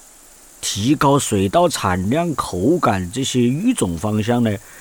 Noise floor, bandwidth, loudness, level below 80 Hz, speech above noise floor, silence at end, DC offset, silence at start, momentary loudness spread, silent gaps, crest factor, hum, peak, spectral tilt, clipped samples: -45 dBFS; 19.5 kHz; -18 LUFS; -46 dBFS; 27 dB; 0 s; under 0.1%; 0.6 s; 6 LU; none; 14 dB; none; -4 dBFS; -5 dB/octave; under 0.1%